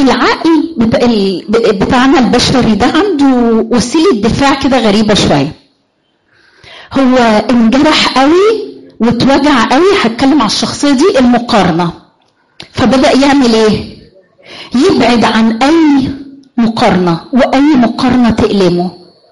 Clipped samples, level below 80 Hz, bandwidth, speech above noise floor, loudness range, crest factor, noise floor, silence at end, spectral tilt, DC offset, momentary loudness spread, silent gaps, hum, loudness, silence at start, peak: under 0.1%; -34 dBFS; 11.5 kHz; 49 dB; 3 LU; 8 dB; -57 dBFS; 0.35 s; -5 dB/octave; 1%; 7 LU; none; none; -9 LUFS; 0 s; 0 dBFS